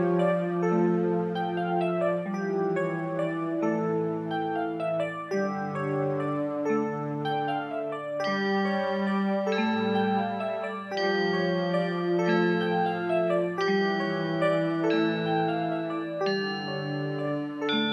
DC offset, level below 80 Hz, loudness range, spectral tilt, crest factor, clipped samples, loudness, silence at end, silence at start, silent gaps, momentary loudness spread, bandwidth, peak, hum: under 0.1%; -74 dBFS; 3 LU; -7 dB/octave; 14 dB; under 0.1%; -28 LUFS; 0 s; 0 s; none; 6 LU; 9.4 kHz; -14 dBFS; none